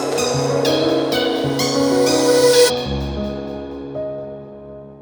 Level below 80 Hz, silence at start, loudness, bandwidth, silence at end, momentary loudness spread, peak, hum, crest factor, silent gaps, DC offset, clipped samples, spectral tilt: -38 dBFS; 0 s; -17 LUFS; over 20 kHz; 0 s; 18 LU; -2 dBFS; none; 16 dB; none; under 0.1%; under 0.1%; -4 dB/octave